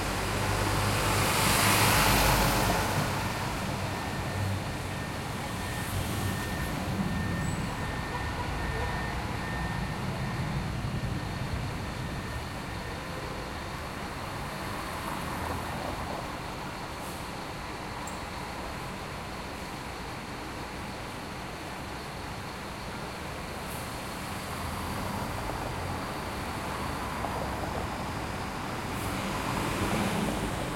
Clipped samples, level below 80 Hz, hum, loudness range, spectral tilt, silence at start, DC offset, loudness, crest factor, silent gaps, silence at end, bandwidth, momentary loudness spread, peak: under 0.1%; -42 dBFS; none; 12 LU; -4 dB/octave; 0 s; under 0.1%; -32 LUFS; 22 dB; none; 0 s; 16.5 kHz; 11 LU; -10 dBFS